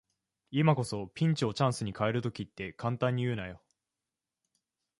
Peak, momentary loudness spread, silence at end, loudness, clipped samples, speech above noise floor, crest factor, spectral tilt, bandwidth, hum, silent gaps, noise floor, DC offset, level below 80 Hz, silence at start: -12 dBFS; 11 LU; 1.45 s; -32 LUFS; under 0.1%; 59 dB; 22 dB; -6.5 dB/octave; 11.5 kHz; none; none; -90 dBFS; under 0.1%; -62 dBFS; 0.5 s